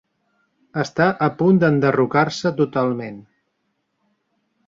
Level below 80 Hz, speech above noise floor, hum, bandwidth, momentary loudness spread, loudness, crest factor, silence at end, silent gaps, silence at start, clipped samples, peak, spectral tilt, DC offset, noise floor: -60 dBFS; 54 dB; none; 7.6 kHz; 12 LU; -19 LUFS; 18 dB; 1.45 s; none; 0.75 s; under 0.1%; -4 dBFS; -7 dB/octave; under 0.1%; -72 dBFS